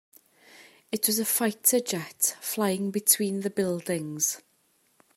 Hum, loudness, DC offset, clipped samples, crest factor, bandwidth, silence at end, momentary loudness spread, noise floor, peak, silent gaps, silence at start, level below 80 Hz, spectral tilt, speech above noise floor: none; -26 LUFS; under 0.1%; under 0.1%; 24 dB; 16 kHz; 0.75 s; 9 LU; -68 dBFS; -4 dBFS; none; 0.55 s; -76 dBFS; -3 dB/octave; 41 dB